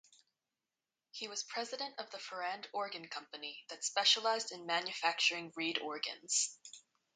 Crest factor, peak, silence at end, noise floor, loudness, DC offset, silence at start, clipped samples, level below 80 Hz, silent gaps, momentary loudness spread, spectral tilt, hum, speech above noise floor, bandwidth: 22 dB; -16 dBFS; 0.35 s; under -90 dBFS; -36 LUFS; under 0.1%; 1.15 s; under 0.1%; under -90 dBFS; none; 14 LU; 0.5 dB/octave; none; over 52 dB; 9.4 kHz